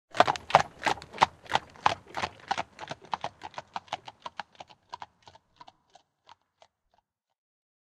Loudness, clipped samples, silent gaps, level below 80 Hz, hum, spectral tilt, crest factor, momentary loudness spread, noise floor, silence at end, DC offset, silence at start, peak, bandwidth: -30 LUFS; under 0.1%; none; -66 dBFS; none; -3 dB/octave; 32 dB; 21 LU; -74 dBFS; 2.95 s; under 0.1%; 0.15 s; 0 dBFS; 13 kHz